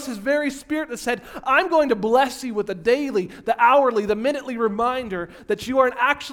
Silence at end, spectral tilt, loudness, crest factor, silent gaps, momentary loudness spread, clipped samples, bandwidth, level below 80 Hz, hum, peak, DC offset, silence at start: 0 s; -4.5 dB/octave; -21 LUFS; 18 dB; none; 10 LU; under 0.1%; 18 kHz; -54 dBFS; none; -2 dBFS; under 0.1%; 0 s